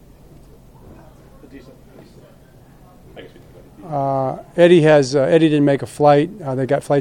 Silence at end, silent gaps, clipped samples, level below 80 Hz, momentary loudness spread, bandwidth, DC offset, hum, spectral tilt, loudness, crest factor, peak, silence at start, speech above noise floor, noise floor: 0 s; none; under 0.1%; -50 dBFS; 12 LU; 13 kHz; under 0.1%; none; -7 dB/octave; -15 LUFS; 18 dB; 0 dBFS; 1.55 s; 30 dB; -46 dBFS